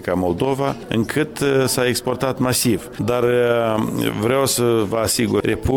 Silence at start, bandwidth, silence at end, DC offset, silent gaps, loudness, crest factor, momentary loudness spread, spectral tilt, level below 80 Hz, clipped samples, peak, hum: 0 s; 17.5 kHz; 0 s; under 0.1%; none; -19 LUFS; 14 dB; 5 LU; -4.5 dB/octave; -42 dBFS; under 0.1%; -4 dBFS; none